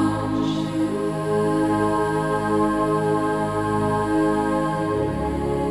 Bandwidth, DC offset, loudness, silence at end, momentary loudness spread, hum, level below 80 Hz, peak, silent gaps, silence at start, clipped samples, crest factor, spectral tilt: 12.5 kHz; 0.2%; -22 LUFS; 0 s; 3 LU; none; -40 dBFS; -10 dBFS; none; 0 s; under 0.1%; 12 dB; -7 dB/octave